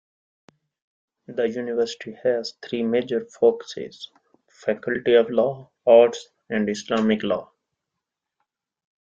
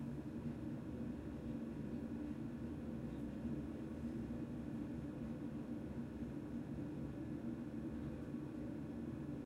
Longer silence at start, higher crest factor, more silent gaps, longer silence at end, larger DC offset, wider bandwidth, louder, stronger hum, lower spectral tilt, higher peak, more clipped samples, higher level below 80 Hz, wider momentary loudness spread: first, 1.3 s vs 0 s; first, 20 dB vs 12 dB; neither; first, 1.65 s vs 0 s; neither; second, 7.6 kHz vs 13.5 kHz; first, -22 LUFS vs -47 LUFS; neither; second, -5.5 dB/octave vs -8.5 dB/octave; first, -4 dBFS vs -32 dBFS; neither; second, -66 dBFS vs -60 dBFS; first, 17 LU vs 1 LU